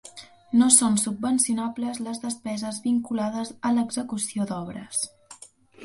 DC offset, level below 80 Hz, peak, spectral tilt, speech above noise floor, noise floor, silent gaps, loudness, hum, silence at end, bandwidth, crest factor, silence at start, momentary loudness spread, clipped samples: under 0.1%; -64 dBFS; -2 dBFS; -3.5 dB/octave; 25 dB; -50 dBFS; none; -24 LUFS; none; 0 s; 11.5 kHz; 22 dB; 0.05 s; 14 LU; under 0.1%